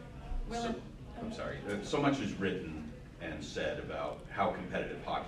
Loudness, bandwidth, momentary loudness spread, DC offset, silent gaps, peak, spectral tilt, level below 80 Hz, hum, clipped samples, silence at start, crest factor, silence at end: -38 LUFS; 12.5 kHz; 13 LU; under 0.1%; none; -18 dBFS; -5.5 dB/octave; -48 dBFS; none; under 0.1%; 0 s; 20 dB; 0 s